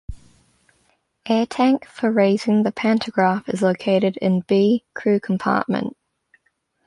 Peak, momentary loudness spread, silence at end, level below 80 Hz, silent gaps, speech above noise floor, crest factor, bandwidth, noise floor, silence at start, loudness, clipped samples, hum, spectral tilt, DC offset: -4 dBFS; 5 LU; 1 s; -50 dBFS; none; 49 dB; 16 dB; 11 kHz; -68 dBFS; 0.1 s; -20 LUFS; under 0.1%; none; -7 dB/octave; under 0.1%